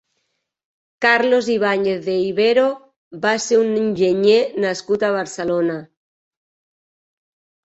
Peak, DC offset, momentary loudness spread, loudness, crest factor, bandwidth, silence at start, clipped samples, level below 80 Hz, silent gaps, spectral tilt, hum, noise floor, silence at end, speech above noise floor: -2 dBFS; under 0.1%; 7 LU; -18 LUFS; 18 dB; 8.2 kHz; 1 s; under 0.1%; -64 dBFS; 2.96-3.11 s; -4.5 dB/octave; none; -73 dBFS; 1.8 s; 56 dB